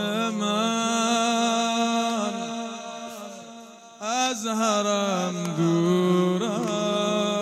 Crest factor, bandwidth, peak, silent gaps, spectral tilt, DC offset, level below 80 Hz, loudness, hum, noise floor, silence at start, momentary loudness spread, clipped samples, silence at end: 16 dB; 15.5 kHz; -8 dBFS; none; -4.5 dB/octave; under 0.1%; -78 dBFS; -24 LUFS; none; -44 dBFS; 0 s; 14 LU; under 0.1%; 0 s